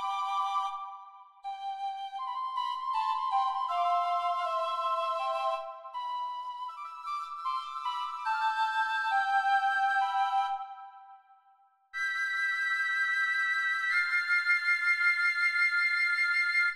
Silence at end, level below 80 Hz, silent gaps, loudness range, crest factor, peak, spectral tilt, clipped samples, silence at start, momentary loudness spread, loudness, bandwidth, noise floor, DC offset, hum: 0 s; -84 dBFS; none; 8 LU; 14 dB; -16 dBFS; 3 dB/octave; under 0.1%; 0 s; 13 LU; -29 LUFS; 13.5 kHz; -65 dBFS; under 0.1%; none